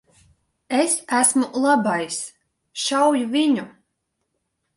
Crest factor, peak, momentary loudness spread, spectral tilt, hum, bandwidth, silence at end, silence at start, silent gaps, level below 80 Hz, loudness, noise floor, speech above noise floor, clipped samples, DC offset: 20 dB; -2 dBFS; 12 LU; -2.5 dB/octave; none; 11.5 kHz; 1.05 s; 0.7 s; none; -68 dBFS; -20 LUFS; -76 dBFS; 56 dB; under 0.1%; under 0.1%